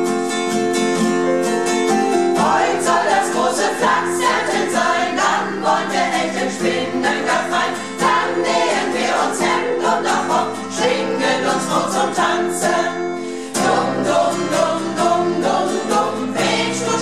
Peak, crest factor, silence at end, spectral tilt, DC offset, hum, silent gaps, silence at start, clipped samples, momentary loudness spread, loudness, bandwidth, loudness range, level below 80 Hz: -4 dBFS; 14 dB; 0 s; -3.5 dB/octave; 0.6%; none; none; 0 s; under 0.1%; 3 LU; -17 LUFS; 14.5 kHz; 2 LU; -60 dBFS